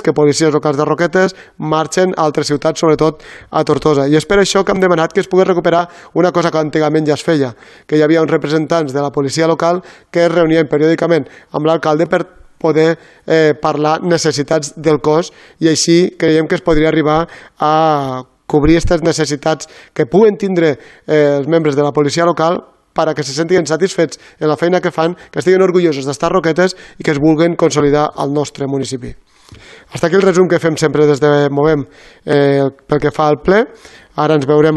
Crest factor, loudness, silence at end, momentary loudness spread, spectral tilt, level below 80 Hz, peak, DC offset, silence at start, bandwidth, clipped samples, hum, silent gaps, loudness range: 12 dB; -13 LUFS; 0 s; 8 LU; -5.5 dB/octave; -38 dBFS; 0 dBFS; under 0.1%; 0 s; 12 kHz; under 0.1%; none; none; 2 LU